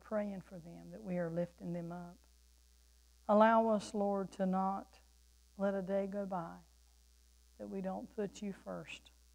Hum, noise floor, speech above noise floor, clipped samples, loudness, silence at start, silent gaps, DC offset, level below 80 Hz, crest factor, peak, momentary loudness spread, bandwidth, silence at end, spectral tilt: none; -66 dBFS; 29 dB; under 0.1%; -37 LUFS; 0.05 s; none; under 0.1%; -66 dBFS; 22 dB; -16 dBFS; 20 LU; 16 kHz; 0.35 s; -7 dB/octave